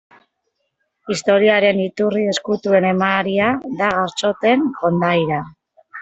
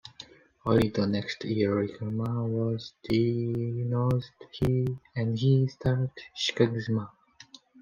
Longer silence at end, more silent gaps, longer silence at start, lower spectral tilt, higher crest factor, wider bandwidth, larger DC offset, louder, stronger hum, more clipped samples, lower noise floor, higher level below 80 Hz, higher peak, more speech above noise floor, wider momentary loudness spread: second, 0 s vs 0.75 s; neither; first, 1.05 s vs 0.05 s; second, -5.5 dB/octave vs -7 dB/octave; about the same, 16 dB vs 20 dB; second, 8.2 kHz vs 9.2 kHz; neither; first, -17 LUFS vs -28 LUFS; neither; neither; first, -72 dBFS vs -54 dBFS; about the same, -58 dBFS vs -56 dBFS; first, -2 dBFS vs -10 dBFS; first, 55 dB vs 27 dB; about the same, 9 LU vs 10 LU